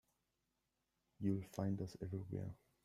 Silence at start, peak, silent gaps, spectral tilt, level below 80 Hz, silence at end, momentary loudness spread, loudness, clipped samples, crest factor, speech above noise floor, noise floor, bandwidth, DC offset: 1.2 s; -26 dBFS; none; -8.5 dB/octave; -72 dBFS; 0.3 s; 6 LU; -45 LUFS; under 0.1%; 20 dB; 44 dB; -87 dBFS; 13.5 kHz; under 0.1%